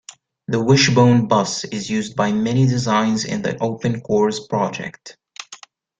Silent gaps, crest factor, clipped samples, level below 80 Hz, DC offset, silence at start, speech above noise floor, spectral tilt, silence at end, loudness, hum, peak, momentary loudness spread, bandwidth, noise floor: none; 16 dB; under 0.1%; -54 dBFS; under 0.1%; 0.5 s; 26 dB; -5.5 dB/octave; 0.45 s; -18 LUFS; none; -2 dBFS; 21 LU; 9.2 kHz; -44 dBFS